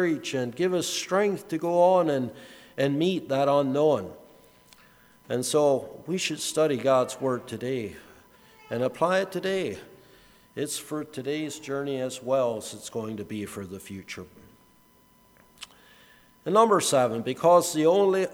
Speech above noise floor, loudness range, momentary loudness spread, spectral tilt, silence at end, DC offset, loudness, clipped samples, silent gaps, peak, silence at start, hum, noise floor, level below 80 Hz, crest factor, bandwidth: 34 dB; 8 LU; 18 LU; -4.5 dB/octave; 0 s; under 0.1%; -26 LUFS; under 0.1%; none; -6 dBFS; 0 s; none; -59 dBFS; -68 dBFS; 20 dB; over 20 kHz